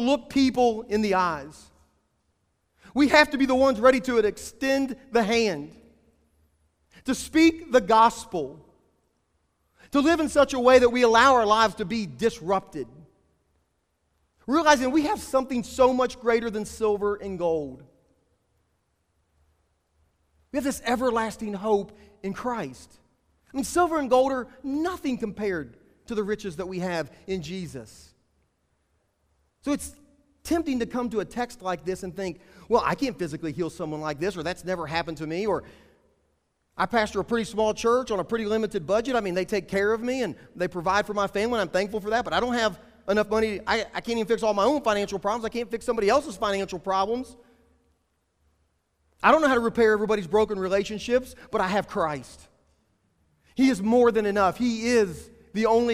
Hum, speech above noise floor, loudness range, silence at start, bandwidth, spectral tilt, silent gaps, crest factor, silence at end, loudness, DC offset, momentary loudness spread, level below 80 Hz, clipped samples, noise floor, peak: none; 49 dB; 9 LU; 0 s; 15.5 kHz; -4.5 dB/octave; none; 22 dB; 0 s; -25 LUFS; under 0.1%; 13 LU; -52 dBFS; under 0.1%; -73 dBFS; -2 dBFS